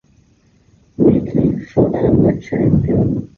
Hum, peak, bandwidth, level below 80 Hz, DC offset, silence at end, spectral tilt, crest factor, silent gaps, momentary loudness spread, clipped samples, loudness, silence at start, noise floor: none; -2 dBFS; 6.8 kHz; -34 dBFS; under 0.1%; 0.1 s; -11 dB/octave; 14 dB; none; 4 LU; under 0.1%; -15 LUFS; 1 s; -53 dBFS